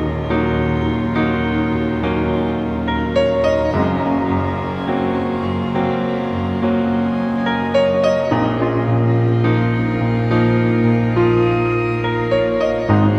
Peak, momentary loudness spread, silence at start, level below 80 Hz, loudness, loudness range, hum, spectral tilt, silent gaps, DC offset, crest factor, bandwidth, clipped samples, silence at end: -2 dBFS; 5 LU; 0 s; -36 dBFS; -18 LUFS; 3 LU; none; -8.5 dB/octave; none; under 0.1%; 14 dB; 6.6 kHz; under 0.1%; 0 s